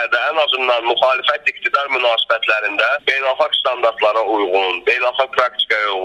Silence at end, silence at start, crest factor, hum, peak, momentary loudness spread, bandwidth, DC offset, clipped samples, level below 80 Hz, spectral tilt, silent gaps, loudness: 0 s; 0 s; 16 dB; none; 0 dBFS; 2 LU; 10.5 kHz; under 0.1%; under 0.1%; -62 dBFS; -1.5 dB/octave; none; -16 LUFS